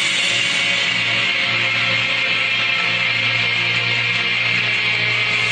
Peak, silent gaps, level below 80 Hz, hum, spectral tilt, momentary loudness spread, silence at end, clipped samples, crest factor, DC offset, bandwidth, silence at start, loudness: -6 dBFS; none; -56 dBFS; none; -1.5 dB/octave; 1 LU; 0 s; under 0.1%; 14 dB; under 0.1%; 11.5 kHz; 0 s; -16 LUFS